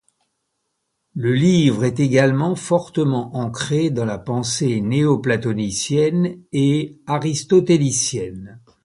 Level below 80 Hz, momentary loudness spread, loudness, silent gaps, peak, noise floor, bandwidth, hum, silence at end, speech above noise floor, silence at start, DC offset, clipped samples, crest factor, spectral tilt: -52 dBFS; 9 LU; -19 LUFS; none; -2 dBFS; -74 dBFS; 11.5 kHz; none; 0.25 s; 55 dB; 1.15 s; under 0.1%; under 0.1%; 18 dB; -5.5 dB/octave